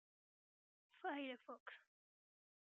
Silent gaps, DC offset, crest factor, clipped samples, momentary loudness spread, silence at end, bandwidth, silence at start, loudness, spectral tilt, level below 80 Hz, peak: 1.60-1.66 s; under 0.1%; 20 dB; under 0.1%; 13 LU; 0.95 s; 7 kHz; 0.95 s; -51 LUFS; 0.5 dB/octave; under -90 dBFS; -36 dBFS